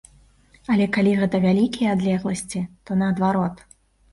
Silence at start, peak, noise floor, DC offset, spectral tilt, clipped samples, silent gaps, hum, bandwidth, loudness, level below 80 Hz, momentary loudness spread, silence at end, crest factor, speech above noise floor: 0.7 s; -8 dBFS; -54 dBFS; under 0.1%; -6.5 dB/octave; under 0.1%; none; none; 11.5 kHz; -22 LUFS; -52 dBFS; 9 LU; 0.6 s; 14 dB; 34 dB